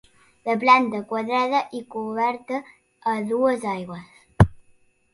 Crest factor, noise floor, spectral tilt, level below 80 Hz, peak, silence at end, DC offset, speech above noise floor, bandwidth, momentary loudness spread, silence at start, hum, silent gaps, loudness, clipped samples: 22 dB; -59 dBFS; -7 dB/octave; -40 dBFS; 0 dBFS; 0.6 s; under 0.1%; 36 dB; 11.5 kHz; 15 LU; 0.45 s; none; none; -23 LUFS; under 0.1%